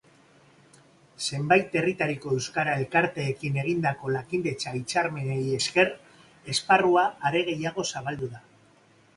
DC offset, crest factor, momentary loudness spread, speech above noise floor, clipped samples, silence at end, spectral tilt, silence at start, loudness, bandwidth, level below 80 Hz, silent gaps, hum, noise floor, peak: under 0.1%; 20 dB; 10 LU; 33 dB; under 0.1%; 0.8 s; -4.5 dB/octave; 1.2 s; -26 LUFS; 11.5 kHz; -62 dBFS; none; none; -59 dBFS; -6 dBFS